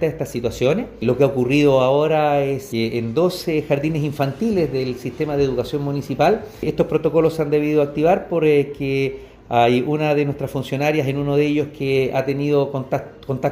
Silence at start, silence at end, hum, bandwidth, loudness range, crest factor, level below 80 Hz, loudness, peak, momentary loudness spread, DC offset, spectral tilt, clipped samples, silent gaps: 0 s; 0 s; none; 16 kHz; 3 LU; 16 dB; -46 dBFS; -19 LUFS; -2 dBFS; 8 LU; under 0.1%; -7 dB/octave; under 0.1%; none